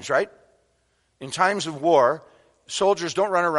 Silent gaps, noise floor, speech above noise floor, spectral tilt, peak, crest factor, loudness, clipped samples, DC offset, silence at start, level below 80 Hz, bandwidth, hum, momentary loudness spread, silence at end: none; -68 dBFS; 46 dB; -3.5 dB/octave; -4 dBFS; 18 dB; -22 LUFS; under 0.1%; under 0.1%; 0 s; -66 dBFS; 11.5 kHz; none; 14 LU; 0 s